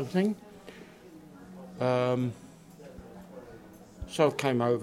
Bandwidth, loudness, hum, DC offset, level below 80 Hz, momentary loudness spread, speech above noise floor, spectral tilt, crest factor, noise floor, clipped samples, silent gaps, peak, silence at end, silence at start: 16.5 kHz; -29 LUFS; none; under 0.1%; -58 dBFS; 23 LU; 23 dB; -6.5 dB/octave; 22 dB; -51 dBFS; under 0.1%; none; -10 dBFS; 0 s; 0 s